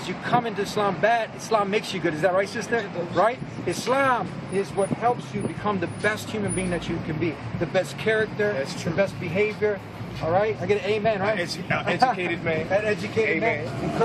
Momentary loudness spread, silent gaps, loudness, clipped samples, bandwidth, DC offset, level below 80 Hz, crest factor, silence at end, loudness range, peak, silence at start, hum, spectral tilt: 6 LU; none; -25 LUFS; under 0.1%; 14 kHz; under 0.1%; -52 dBFS; 18 dB; 0 s; 2 LU; -6 dBFS; 0 s; none; -5.5 dB/octave